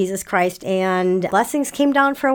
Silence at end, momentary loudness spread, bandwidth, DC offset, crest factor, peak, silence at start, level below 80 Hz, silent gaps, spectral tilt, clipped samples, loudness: 0 s; 4 LU; 19 kHz; under 0.1%; 14 dB; -4 dBFS; 0 s; -56 dBFS; none; -5 dB/octave; under 0.1%; -19 LUFS